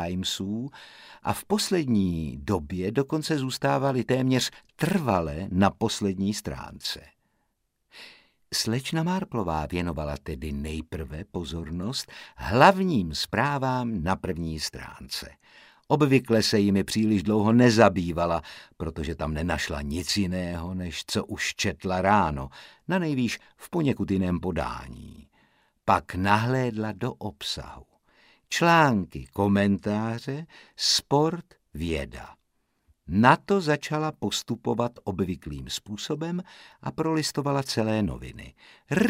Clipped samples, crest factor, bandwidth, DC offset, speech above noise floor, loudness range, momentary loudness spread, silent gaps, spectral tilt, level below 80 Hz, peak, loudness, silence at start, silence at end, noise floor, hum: under 0.1%; 24 dB; 16 kHz; under 0.1%; 49 dB; 6 LU; 15 LU; none; -5 dB/octave; -46 dBFS; -2 dBFS; -26 LUFS; 0 s; 0 s; -75 dBFS; none